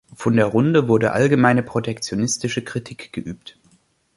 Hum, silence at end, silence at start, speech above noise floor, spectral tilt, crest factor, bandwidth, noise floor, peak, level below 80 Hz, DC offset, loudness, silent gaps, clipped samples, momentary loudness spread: none; 0.65 s; 0.2 s; 40 dB; -5.5 dB/octave; 18 dB; 11.5 kHz; -59 dBFS; -2 dBFS; -54 dBFS; under 0.1%; -19 LUFS; none; under 0.1%; 15 LU